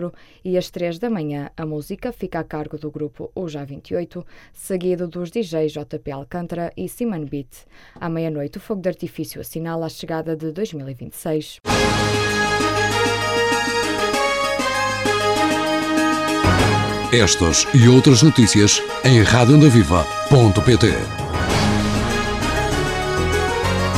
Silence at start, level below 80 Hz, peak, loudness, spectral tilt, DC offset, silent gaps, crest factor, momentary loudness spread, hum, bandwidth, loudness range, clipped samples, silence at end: 0 s; -36 dBFS; -2 dBFS; -18 LUFS; -5 dB/octave; under 0.1%; none; 16 dB; 17 LU; none; 15.5 kHz; 14 LU; under 0.1%; 0 s